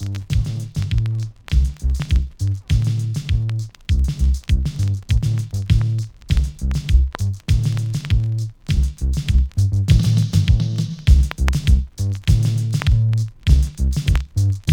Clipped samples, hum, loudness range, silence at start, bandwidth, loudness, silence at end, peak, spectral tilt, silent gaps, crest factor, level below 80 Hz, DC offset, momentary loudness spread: under 0.1%; none; 4 LU; 0 s; 15 kHz; -20 LUFS; 0 s; -2 dBFS; -6 dB/octave; none; 14 dB; -20 dBFS; under 0.1%; 7 LU